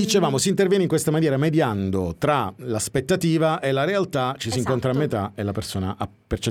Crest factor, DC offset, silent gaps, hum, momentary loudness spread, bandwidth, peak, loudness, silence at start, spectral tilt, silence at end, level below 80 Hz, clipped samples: 16 dB; under 0.1%; none; none; 8 LU; 17.5 kHz; -6 dBFS; -22 LUFS; 0 s; -5.5 dB/octave; 0 s; -48 dBFS; under 0.1%